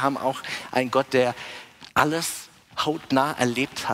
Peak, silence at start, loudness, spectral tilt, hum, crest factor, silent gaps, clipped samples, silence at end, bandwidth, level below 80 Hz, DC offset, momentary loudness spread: -2 dBFS; 0 s; -24 LUFS; -4 dB/octave; none; 22 dB; none; under 0.1%; 0 s; 16 kHz; -60 dBFS; under 0.1%; 14 LU